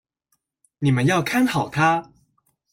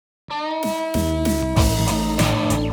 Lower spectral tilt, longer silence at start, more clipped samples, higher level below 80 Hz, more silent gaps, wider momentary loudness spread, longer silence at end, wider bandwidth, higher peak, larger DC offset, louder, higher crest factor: about the same, -6 dB/octave vs -5 dB/octave; first, 0.8 s vs 0.3 s; neither; second, -56 dBFS vs -28 dBFS; neither; about the same, 5 LU vs 7 LU; first, 0.7 s vs 0 s; second, 16.5 kHz vs over 20 kHz; second, -8 dBFS vs -4 dBFS; neither; about the same, -20 LUFS vs -21 LUFS; about the same, 14 dB vs 16 dB